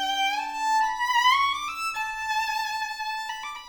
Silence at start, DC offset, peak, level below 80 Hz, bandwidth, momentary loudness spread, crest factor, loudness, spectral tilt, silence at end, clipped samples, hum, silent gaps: 0 s; under 0.1%; -10 dBFS; -60 dBFS; over 20 kHz; 10 LU; 16 dB; -25 LUFS; 1.5 dB/octave; 0 s; under 0.1%; none; none